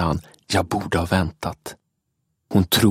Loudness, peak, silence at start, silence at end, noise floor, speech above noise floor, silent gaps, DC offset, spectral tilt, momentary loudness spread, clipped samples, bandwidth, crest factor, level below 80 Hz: -22 LUFS; -4 dBFS; 0 s; 0 s; -74 dBFS; 54 dB; none; under 0.1%; -5 dB/octave; 12 LU; under 0.1%; 16.5 kHz; 18 dB; -40 dBFS